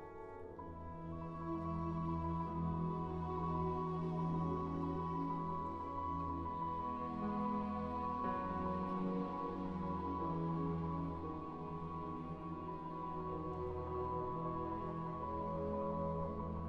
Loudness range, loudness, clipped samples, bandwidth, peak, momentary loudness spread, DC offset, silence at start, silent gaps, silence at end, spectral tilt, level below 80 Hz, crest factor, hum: 3 LU; -42 LUFS; under 0.1%; 5.8 kHz; -28 dBFS; 6 LU; under 0.1%; 0 s; none; 0 s; -10 dB/octave; -56 dBFS; 12 dB; none